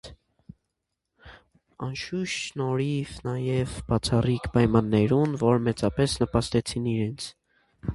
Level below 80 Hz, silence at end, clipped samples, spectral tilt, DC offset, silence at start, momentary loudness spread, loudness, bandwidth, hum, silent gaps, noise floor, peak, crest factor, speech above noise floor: -46 dBFS; 0 s; under 0.1%; -6 dB/octave; under 0.1%; 0.05 s; 10 LU; -26 LUFS; 11.5 kHz; none; none; -82 dBFS; -6 dBFS; 22 dB; 57 dB